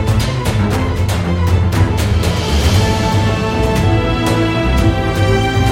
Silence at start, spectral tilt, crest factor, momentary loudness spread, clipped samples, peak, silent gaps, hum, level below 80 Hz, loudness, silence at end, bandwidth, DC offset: 0 s; -6 dB/octave; 12 dB; 3 LU; under 0.1%; -2 dBFS; none; none; -22 dBFS; -14 LUFS; 0 s; 16.5 kHz; under 0.1%